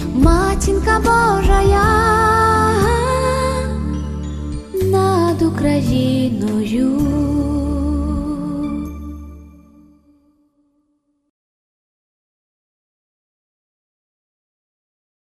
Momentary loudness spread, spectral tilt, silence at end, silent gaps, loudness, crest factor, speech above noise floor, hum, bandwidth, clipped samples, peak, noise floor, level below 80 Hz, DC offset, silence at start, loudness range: 12 LU; -6.5 dB/octave; 5.8 s; none; -16 LUFS; 18 dB; 52 dB; none; 14 kHz; under 0.1%; 0 dBFS; -66 dBFS; -26 dBFS; under 0.1%; 0 s; 12 LU